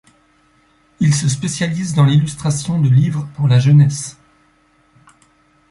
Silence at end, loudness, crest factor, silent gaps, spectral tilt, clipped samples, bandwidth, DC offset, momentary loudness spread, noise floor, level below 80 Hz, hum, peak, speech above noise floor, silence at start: 1.6 s; -15 LUFS; 14 dB; none; -6 dB/octave; under 0.1%; 11.5 kHz; under 0.1%; 8 LU; -56 dBFS; -50 dBFS; none; -2 dBFS; 41 dB; 1 s